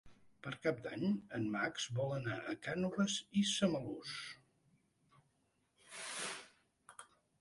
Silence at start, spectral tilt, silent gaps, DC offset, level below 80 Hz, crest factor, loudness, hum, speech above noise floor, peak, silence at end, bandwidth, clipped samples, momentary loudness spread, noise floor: 0.05 s; -4.5 dB/octave; none; under 0.1%; -74 dBFS; 20 dB; -39 LUFS; none; 41 dB; -20 dBFS; 0.35 s; 11.5 kHz; under 0.1%; 17 LU; -79 dBFS